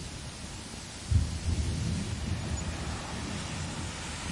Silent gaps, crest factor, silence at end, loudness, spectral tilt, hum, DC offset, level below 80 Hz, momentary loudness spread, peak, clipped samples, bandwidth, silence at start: none; 20 dB; 0 s; -34 LUFS; -4.5 dB/octave; none; under 0.1%; -40 dBFS; 10 LU; -14 dBFS; under 0.1%; 11.5 kHz; 0 s